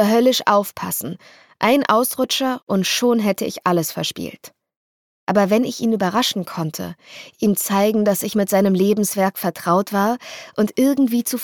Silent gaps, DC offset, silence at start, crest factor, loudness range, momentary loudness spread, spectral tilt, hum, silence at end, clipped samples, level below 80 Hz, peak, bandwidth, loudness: 2.63-2.67 s, 4.76-5.27 s; under 0.1%; 0 s; 16 dB; 3 LU; 11 LU; -4.5 dB/octave; none; 0 s; under 0.1%; -66 dBFS; -2 dBFS; 19 kHz; -19 LUFS